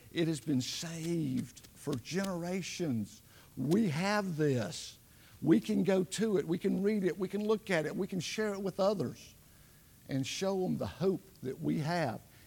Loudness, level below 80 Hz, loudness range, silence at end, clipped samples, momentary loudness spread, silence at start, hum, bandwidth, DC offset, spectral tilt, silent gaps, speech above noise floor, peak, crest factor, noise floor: -34 LUFS; -68 dBFS; 4 LU; 0.25 s; under 0.1%; 9 LU; 0.05 s; none; 18 kHz; under 0.1%; -5.5 dB/octave; none; 26 dB; -14 dBFS; 20 dB; -60 dBFS